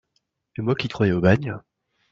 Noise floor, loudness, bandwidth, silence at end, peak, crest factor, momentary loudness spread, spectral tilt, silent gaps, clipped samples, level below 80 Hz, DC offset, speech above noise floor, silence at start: -73 dBFS; -22 LUFS; 7.4 kHz; 0.55 s; -4 dBFS; 20 dB; 17 LU; -8 dB/octave; none; under 0.1%; -52 dBFS; under 0.1%; 52 dB; 0.6 s